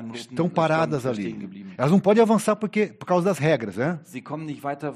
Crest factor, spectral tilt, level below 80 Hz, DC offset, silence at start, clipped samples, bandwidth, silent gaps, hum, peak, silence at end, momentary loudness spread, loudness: 16 dB; -6.5 dB/octave; -66 dBFS; under 0.1%; 0 s; under 0.1%; 13.5 kHz; none; none; -6 dBFS; 0 s; 15 LU; -23 LUFS